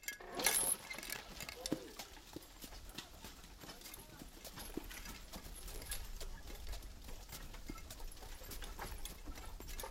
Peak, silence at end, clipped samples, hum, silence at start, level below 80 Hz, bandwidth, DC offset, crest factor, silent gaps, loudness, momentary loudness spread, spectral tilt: -16 dBFS; 0 s; under 0.1%; none; 0 s; -52 dBFS; 16.5 kHz; under 0.1%; 30 dB; none; -45 LUFS; 17 LU; -2 dB/octave